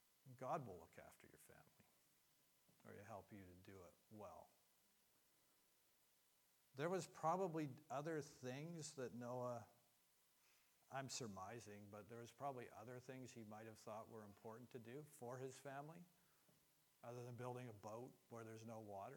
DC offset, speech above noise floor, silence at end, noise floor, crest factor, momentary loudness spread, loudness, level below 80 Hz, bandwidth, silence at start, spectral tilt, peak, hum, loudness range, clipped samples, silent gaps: under 0.1%; 27 dB; 0 s; -80 dBFS; 24 dB; 17 LU; -54 LUFS; under -90 dBFS; 19 kHz; 0.25 s; -5 dB/octave; -32 dBFS; none; 15 LU; under 0.1%; none